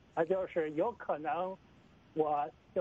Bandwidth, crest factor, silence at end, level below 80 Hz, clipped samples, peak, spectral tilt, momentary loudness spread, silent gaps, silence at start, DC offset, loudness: 7.4 kHz; 18 dB; 0 s; -70 dBFS; under 0.1%; -18 dBFS; -8 dB/octave; 8 LU; none; 0.15 s; under 0.1%; -35 LUFS